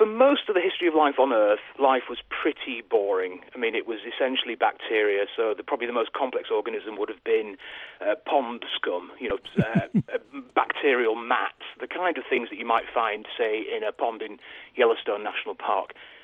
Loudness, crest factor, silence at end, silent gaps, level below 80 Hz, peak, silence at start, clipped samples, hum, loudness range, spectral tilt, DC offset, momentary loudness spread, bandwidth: -26 LUFS; 18 dB; 0.05 s; none; -64 dBFS; -6 dBFS; 0 s; under 0.1%; none; 4 LU; -7.5 dB/octave; under 0.1%; 11 LU; 4.1 kHz